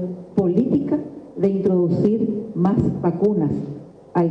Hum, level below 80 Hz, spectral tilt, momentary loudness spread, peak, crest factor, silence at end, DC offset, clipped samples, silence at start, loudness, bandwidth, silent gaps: none; -50 dBFS; -11 dB/octave; 8 LU; -4 dBFS; 16 dB; 0 s; under 0.1%; under 0.1%; 0 s; -21 LUFS; 5.8 kHz; none